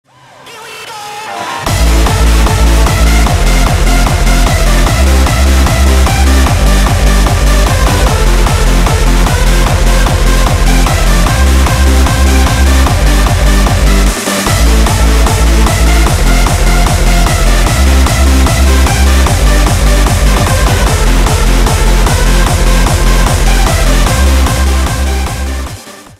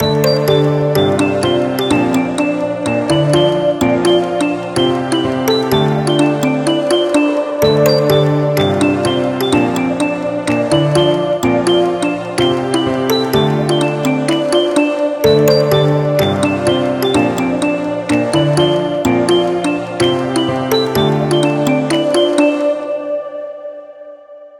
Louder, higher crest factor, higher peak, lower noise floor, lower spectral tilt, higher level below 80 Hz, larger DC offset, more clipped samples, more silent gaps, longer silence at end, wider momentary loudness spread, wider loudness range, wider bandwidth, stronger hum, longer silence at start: first, -9 LUFS vs -14 LUFS; second, 8 dB vs 14 dB; about the same, 0 dBFS vs 0 dBFS; about the same, -34 dBFS vs -36 dBFS; about the same, -4.5 dB/octave vs -5.5 dB/octave; first, -8 dBFS vs -44 dBFS; neither; neither; neither; first, 0.15 s vs 0 s; about the same, 3 LU vs 5 LU; about the same, 1 LU vs 1 LU; about the same, 16 kHz vs 17 kHz; neither; first, 0.45 s vs 0 s